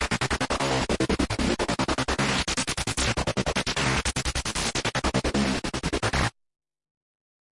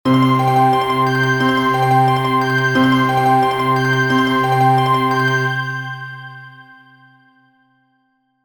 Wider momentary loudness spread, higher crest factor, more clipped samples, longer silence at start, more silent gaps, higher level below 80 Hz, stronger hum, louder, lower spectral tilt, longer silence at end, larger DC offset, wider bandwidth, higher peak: second, 3 LU vs 10 LU; about the same, 16 dB vs 14 dB; neither; about the same, 0 s vs 0.05 s; neither; first, -38 dBFS vs -54 dBFS; neither; second, -26 LUFS vs -15 LUFS; second, -3.5 dB/octave vs -6 dB/octave; second, 1.2 s vs 1.8 s; second, under 0.1% vs 0.2%; second, 11.5 kHz vs over 20 kHz; second, -12 dBFS vs -2 dBFS